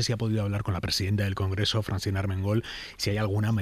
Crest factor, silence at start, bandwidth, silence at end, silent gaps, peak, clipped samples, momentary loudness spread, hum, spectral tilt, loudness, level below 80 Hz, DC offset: 14 dB; 0 s; 15 kHz; 0 s; none; -12 dBFS; under 0.1%; 3 LU; none; -5.5 dB/octave; -28 LUFS; -48 dBFS; under 0.1%